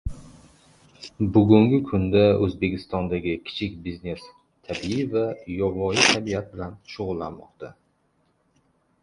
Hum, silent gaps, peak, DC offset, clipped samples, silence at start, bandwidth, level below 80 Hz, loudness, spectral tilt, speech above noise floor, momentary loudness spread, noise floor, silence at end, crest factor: none; none; 0 dBFS; under 0.1%; under 0.1%; 0.05 s; 11.5 kHz; -44 dBFS; -23 LUFS; -5 dB/octave; 44 dB; 20 LU; -67 dBFS; 1.3 s; 24 dB